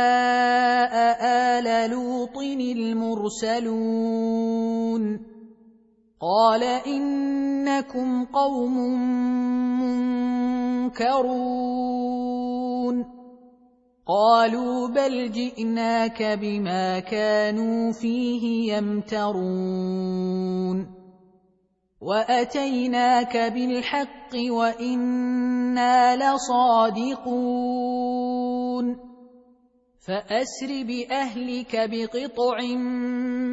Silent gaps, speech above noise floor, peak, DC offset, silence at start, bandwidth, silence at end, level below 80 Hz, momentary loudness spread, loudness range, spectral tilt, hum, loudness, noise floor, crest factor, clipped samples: none; 44 dB; -6 dBFS; under 0.1%; 0 s; 8 kHz; 0 s; -62 dBFS; 8 LU; 6 LU; -5.5 dB/octave; none; -24 LUFS; -67 dBFS; 18 dB; under 0.1%